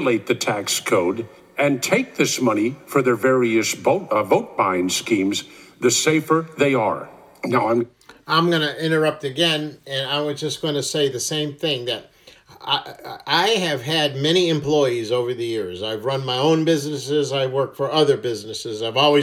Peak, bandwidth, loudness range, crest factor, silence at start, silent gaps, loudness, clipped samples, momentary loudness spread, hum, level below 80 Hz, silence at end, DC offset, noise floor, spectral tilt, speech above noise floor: -2 dBFS; 16.5 kHz; 3 LU; 18 dB; 0 s; none; -20 LUFS; under 0.1%; 8 LU; none; -66 dBFS; 0 s; under 0.1%; -48 dBFS; -4 dB/octave; 28 dB